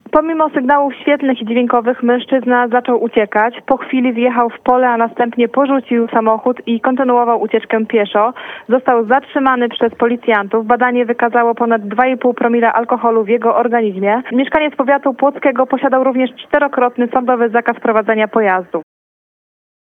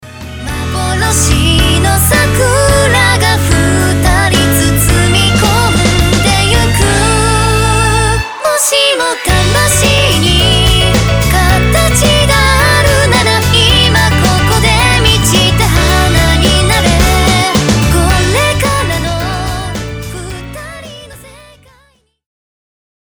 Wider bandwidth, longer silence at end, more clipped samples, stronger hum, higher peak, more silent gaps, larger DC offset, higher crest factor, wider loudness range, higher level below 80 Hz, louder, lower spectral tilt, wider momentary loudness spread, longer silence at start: second, 3.9 kHz vs over 20 kHz; second, 1 s vs 1.75 s; neither; neither; about the same, 0 dBFS vs 0 dBFS; neither; second, under 0.1% vs 0.2%; about the same, 12 dB vs 10 dB; second, 1 LU vs 6 LU; second, -56 dBFS vs -18 dBFS; second, -14 LUFS vs -9 LUFS; first, -8 dB/octave vs -4 dB/octave; second, 3 LU vs 9 LU; first, 0.15 s vs 0 s